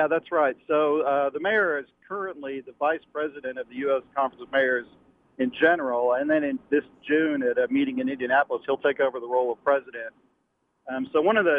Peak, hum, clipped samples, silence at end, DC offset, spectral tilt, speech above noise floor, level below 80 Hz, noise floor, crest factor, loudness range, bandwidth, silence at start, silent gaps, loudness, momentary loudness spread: -6 dBFS; none; under 0.1%; 0 s; under 0.1%; -7.5 dB/octave; 48 dB; -70 dBFS; -73 dBFS; 18 dB; 4 LU; 4.6 kHz; 0 s; none; -25 LUFS; 11 LU